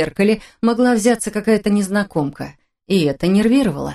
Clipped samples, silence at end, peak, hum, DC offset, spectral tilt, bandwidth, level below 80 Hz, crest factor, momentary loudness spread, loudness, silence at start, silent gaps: under 0.1%; 0 s; -2 dBFS; none; under 0.1%; -5.5 dB/octave; 13 kHz; -46 dBFS; 16 dB; 8 LU; -17 LUFS; 0 s; none